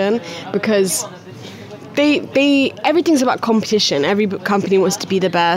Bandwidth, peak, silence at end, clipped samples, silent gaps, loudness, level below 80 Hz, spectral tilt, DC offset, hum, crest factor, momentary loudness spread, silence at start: 16 kHz; -4 dBFS; 0 s; under 0.1%; none; -16 LUFS; -66 dBFS; -4 dB/octave; under 0.1%; none; 12 dB; 14 LU; 0 s